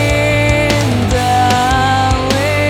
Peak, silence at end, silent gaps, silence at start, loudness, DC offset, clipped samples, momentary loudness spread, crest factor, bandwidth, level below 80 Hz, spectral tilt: 0 dBFS; 0 s; none; 0 s; -12 LUFS; under 0.1%; under 0.1%; 2 LU; 12 dB; 16.5 kHz; -24 dBFS; -5 dB/octave